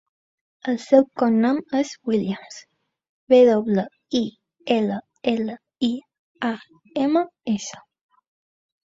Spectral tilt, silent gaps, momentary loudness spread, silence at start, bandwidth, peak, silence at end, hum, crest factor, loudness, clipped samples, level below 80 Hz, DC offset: -6 dB/octave; 3.09-3.27 s, 6.19-6.35 s; 16 LU; 0.65 s; 7.8 kHz; -4 dBFS; 1.05 s; none; 20 dB; -22 LUFS; under 0.1%; -66 dBFS; under 0.1%